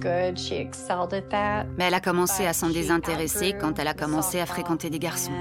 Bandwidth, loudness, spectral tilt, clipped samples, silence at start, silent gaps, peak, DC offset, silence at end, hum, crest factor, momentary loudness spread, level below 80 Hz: 17 kHz; -26 LUFS; -4 dB/octave; under 0.1%; 0 s; none; -8 dBFS; under 0.1%; 0 s; none; 18 dB; 5 LU; -48 dBFS